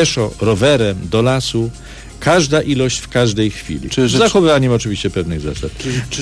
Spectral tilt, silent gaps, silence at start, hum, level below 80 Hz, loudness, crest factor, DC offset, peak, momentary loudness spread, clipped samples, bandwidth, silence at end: -5 dB/octave; none; 0 s; none; -34 dBFS; -15 LUFS; 14 dB; under 0.1%; -2 dBFS; 11 LU; under 0.1%; 11 kHz; 0 s